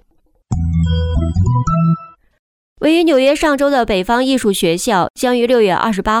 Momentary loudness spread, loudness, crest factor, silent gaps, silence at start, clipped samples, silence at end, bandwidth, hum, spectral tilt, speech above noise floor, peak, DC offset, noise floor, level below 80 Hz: 5 LU; -15 LUFS; 12 dB; 2.39-2.76 s, 5.10-5.14 s; 0.5 s; under 0.1%; 0 s; 17 kHz; none; -6 dB/octave; 43 dB; -2 dBFS; under 0.1%; -56 dBFS; -28 dBFS